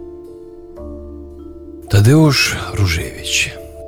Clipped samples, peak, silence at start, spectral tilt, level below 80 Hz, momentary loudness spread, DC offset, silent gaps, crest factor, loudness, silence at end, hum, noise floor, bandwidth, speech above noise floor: under 0.1%; -2 dBFS; 0 s; -5 dB/octave; -34 dBFS; 25 LU; under 0.1%; none; 14 dB; -14 LUFS; 0 s; none; -35 dBFS; 17 kHz; 22 dB